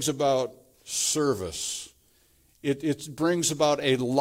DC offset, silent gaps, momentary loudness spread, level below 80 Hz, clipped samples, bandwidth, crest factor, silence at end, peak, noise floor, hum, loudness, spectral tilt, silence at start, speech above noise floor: under 0.1%; none; 10 LU; -62 dBFS; under 0.1%; 16.5 kHz; 18 dB; 0 s; -8 dBFS; -63 dBFS; none; -27 LUFS; -3.5 dB/octave; 0 s; 37 dB